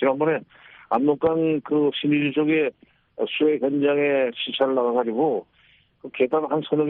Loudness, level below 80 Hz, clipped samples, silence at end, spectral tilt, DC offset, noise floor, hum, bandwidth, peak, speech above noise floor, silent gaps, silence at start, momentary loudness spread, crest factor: -22 LUFS; -66 dBFS; under 0.1%; 0 s; -4 dB/octave; under 0.1%; -59 dBFS; none; 4.1 kHz; -8 dBFS; 37 dB; none; 0 s; 7 LU; 14 dB